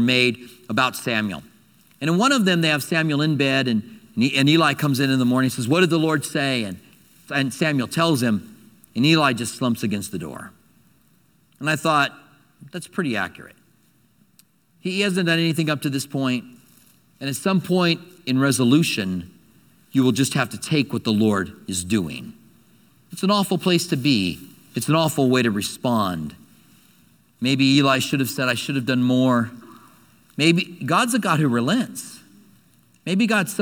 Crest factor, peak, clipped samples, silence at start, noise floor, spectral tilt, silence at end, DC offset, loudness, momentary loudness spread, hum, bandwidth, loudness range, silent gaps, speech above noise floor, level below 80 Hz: 20 dB; -2 dBFS; under 0.1%; 0 s; -60 dBFS; -5 dB/octave; 0 s; under 0.1%; -21 LUFS; 13 LU; none; 19 kHz; 6 LU; none; 39 dB; -62 dBFS